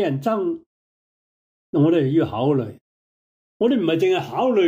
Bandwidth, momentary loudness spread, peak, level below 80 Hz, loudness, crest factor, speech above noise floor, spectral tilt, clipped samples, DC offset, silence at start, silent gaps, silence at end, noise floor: 15.5 kHz; 9 LU; -8 dBFS; -62 dBFS; -21 LUFS; 14 dB; over 71 dB; -8 dB/octave; under 0.1%; under 0.1%; 0 s; 0.66-1.73 s, 2.81-3.60 s; 0 s; under -90 dBFS